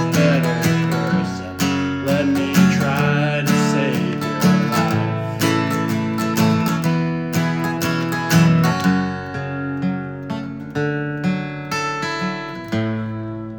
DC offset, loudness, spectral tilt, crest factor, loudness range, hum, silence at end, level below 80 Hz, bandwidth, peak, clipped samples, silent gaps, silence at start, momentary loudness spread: under 0.1%; -19 LUFS; -6 dB/octave; 16 dB; 6 LU; none; 0 s; -52 dBFS; 19 kHz; -2 dBFS; under 0.1%; none; 0 s; 10 LU